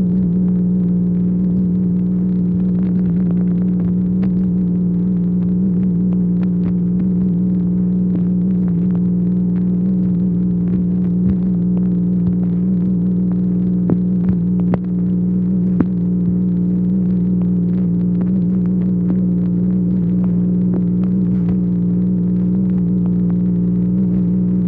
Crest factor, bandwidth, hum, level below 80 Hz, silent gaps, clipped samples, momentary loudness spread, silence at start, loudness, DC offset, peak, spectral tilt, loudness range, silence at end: 16 dB; 2.2 kHz; 60 Hz at -25 dBFS; -36 dBFS; none; under 0.1%; 1 LU; 0 s; -16 LUFS; under 0.1%; 0 dBFS; -14 dB/octave; 0 LU; 0 s